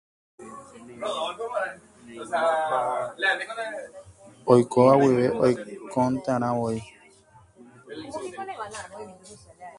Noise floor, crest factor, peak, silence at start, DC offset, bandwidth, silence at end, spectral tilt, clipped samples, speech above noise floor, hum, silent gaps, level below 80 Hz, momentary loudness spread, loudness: -55 dBFS; 22 dB; -4 dBFS; 0.4 s; under 0.1%; 11.5 kHz; 0 s; -6 dB/octave; under 0.1%; 31 dB; none; none; -62 dBFS; 24 LU; -25 LUFS